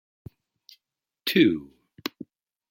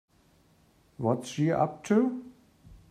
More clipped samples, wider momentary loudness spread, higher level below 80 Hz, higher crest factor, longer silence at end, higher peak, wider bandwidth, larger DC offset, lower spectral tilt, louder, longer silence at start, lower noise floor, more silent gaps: neither; first, 24 LU vs 6 LU; about the same, -66 dBFS vs -64 dBFS; about the same, 22 dB vs 18 dB; first, 0.65 s vs 0.15 s; first, -6 dBFS vs -12 dBFS; first, 16.5 kHz vs 14 kHz; neither; second, -5.5 dB/octave vs -7 dB/octave; first, -25 LUFS vs -28 LUFS; first, 1.25 s vs 1 s; first, -84 dBFS vs -64 dBFS; neither